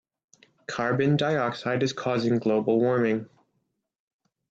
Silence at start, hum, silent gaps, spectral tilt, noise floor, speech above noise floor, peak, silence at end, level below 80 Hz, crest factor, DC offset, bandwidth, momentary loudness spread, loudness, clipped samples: 0.7 s; none; none; -6.5 dB/octave; -77 dBFS; 52 dB; -12 dBFS; 1.25 s; -68 dBFS; 16 dB; under 0.1%; 8 kHz; 7 LU; -25 LUFS; under 0.1%